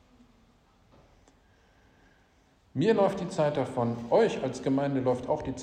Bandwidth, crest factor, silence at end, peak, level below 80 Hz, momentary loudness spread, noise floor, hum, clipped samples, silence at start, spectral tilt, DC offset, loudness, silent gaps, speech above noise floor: 10 kHz; 20 dB; 0 s; -10 dBFS; -60 dBFS; 7 LU; -64 dBFS; none; under 0.1%; 2.75 s; -7 dB/octave; under 0.1%; -28 LUFS; none; 37 dB